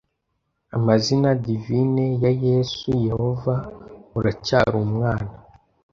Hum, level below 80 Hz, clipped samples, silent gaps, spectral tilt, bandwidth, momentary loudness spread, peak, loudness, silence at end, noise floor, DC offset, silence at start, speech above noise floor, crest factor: none; -46 dBFS; under 0.1%; none; -7 dB/octave; 7.4 kHz; 9 LU; -2 dBFS; -22 LUFS; 0.55 s; -74 dBFS; under 0.1%; 0.75 s; 54 dB; 20 dB